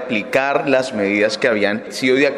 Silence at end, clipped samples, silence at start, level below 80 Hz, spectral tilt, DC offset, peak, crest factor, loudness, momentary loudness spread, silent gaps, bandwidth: 0 s; under 0.1%; 0 s; -60 dBFS; -4.5 dB/octave; under 0.1%; -2 dBFS; 16 dB; -17 LUFS; 3 LU; none; 15 kHz